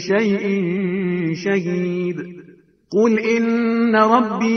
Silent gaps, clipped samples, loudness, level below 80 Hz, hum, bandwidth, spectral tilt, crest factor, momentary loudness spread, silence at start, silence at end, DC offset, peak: none; under 0.1%; -18 LUFS; -62 dBFS; none; 6.6 kHz; -7 dB/octave; 18 dB; 8 LU; 0 s; 0 s; under 0.1%; 0 dBFS